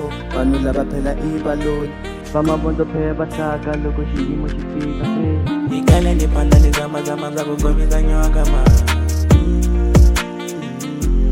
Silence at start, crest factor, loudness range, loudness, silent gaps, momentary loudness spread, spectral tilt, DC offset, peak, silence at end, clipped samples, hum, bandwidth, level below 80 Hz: 0 s; 16 dB; 5 LU; -18 LUFS; none; 10 LU; -6.5 dB/octave; under 0.1%; 0 dBFS; 0 s; under 0.1%; none; 16 kHz; -18 dBFS